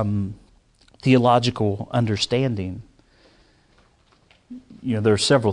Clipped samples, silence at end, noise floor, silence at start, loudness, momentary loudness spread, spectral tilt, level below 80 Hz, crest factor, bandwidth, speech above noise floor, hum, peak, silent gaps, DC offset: under 0.1%; 0 s; -58 dBFS; 0 s; -21 LUFS; 20 LU; -5.5 dB/octave; -54 dBFS; 18 dB; 11 kHz; 38 dB; none; -4 dBFS; none; under 0.1%